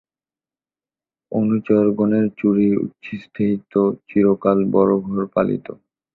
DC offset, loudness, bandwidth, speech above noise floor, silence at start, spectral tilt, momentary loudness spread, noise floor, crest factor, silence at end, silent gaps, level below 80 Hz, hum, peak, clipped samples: under 0.1%; -19 LUFS; 4.2 kHz; over 72 dB; 1.3 s; -11.5 dB/octave; 11 LU; under -90 dBFS; 16 dB; 0.4 s; none; -56 dBFS; none; -4 dBFS; under 0.1%